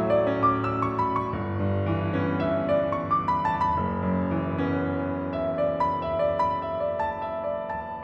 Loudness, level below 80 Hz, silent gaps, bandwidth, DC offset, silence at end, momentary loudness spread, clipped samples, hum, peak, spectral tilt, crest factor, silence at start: -26 LUFS; -48 dBFS; none; 7.4 kHz; under 0.1%; 0 s; 6 LU; under 0.1%; none; -10 dBFS; -9 dB/octave; 16 dB; 0 s